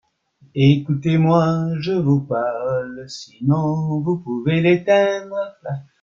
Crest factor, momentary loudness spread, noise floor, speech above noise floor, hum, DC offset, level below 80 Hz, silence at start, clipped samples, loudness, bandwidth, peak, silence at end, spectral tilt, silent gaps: 16 dB; 14 LU; -56 dBFS; 37 dB; none; under 0.1%; -56 dBFS; 0.55 s; under 0.1%; -19 LUFS; 7.4 kHz; -2 dBFS; 0.2 s; -8 dB/octave; none